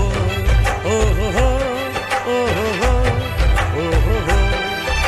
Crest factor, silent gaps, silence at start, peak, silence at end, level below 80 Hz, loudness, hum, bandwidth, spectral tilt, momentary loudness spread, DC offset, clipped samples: 12 dB; none; 0 s; -6 dBFS; 0 s; -20 dBFS; -18 LUFS; none; 14 kHz; -5 dB/octave; 3 LU; under 0.1%; under 0.1%